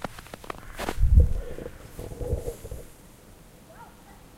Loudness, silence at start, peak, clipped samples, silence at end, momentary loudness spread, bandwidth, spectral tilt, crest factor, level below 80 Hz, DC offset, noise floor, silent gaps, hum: -28 LUFS; 0 s; -6 dBFS; under 0.1%; 0.25 s; 27 LU; 16 kHz; -6.5 dB/octave; 22 dB; -30 dBFS; under 0.1%; -50 dBFS; none; none